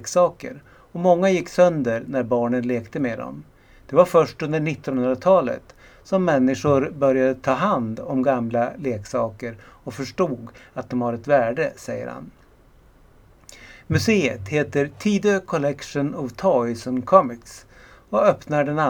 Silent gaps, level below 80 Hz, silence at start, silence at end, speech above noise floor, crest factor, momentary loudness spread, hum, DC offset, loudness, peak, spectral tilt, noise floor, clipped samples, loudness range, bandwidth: none; -54 dBFS; 0 s; 0 s; 31 dB; 22 dB; 15 LU; none; under 0.1%; -21 LUFS; 0 dBFS; -6.5 dB/octave; -52 dBFS; under 0.1%; 5 LU; 18 kHz